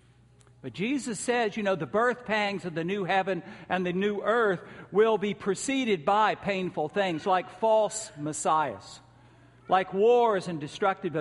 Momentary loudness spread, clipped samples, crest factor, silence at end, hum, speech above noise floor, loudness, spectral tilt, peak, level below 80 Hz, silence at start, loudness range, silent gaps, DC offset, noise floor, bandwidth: 10 LU; under 0.1%; 16 dB; 0 s; none; 31 dB; -27 LUFS; -4.5 dB/octave; -12 dBFS; -66 dBFS; 0.65 s; 2 LU; none; under 0.1%; -58 dBFS; 11.5 kHz